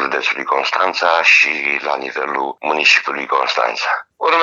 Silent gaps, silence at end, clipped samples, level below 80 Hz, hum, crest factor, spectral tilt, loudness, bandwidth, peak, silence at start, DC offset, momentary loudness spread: none; 0 s; under 0.1%; -72 dBFS; none; 16 dB; -0.5 dB/octave; -15 LUFS; 8.4 kHz; 0 dBFS; 0 s; under 0.1%; 11 LU